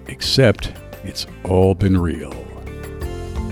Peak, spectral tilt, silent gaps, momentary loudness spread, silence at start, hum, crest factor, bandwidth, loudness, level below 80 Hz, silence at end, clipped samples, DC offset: -2 dBFS; -6 dB/octave; none; 18 LU; 0 s; none; 18 dB; 18.5 kHz; -19 LUFS; -32 dBFS; 0 s; under 0.1%; under 0.1%